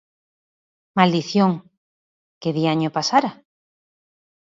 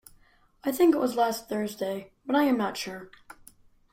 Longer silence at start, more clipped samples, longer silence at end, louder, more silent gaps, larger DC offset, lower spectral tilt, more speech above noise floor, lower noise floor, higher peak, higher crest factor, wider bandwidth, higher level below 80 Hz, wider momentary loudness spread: first, 0.95 s vs 0.65 s; neither; first, 1.25 s vs 0.6 s; first, -20 LUFS vs -27 LUFS; first, 1.77-2.41 s vs none; neither; about the same, -5.5 dB/octave vs -4.5 dB/octave; first, over 71 dB vs 34 dB; first, under -90 dBFS vs -60 dBFS; first, -2 dBFS vs -12 dBFS; about the same, 22 dB vs 18 dB; second, 7.6 kHz vs 16.5 kHz; about the same, -68 dBFS vs -66 dBFS; second, 11 LU vs 15 LU